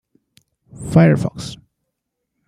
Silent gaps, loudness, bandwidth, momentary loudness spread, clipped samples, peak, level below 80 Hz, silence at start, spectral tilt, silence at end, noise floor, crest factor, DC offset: none; -15 LUFS; 11 kHz; 20 LU; under 0.1%; -2 dBFS; -48 dBFS; 0.8 s; -7.5 dB/octave; 0.9 s; -77 dBFS; 18 dB; under 0.1%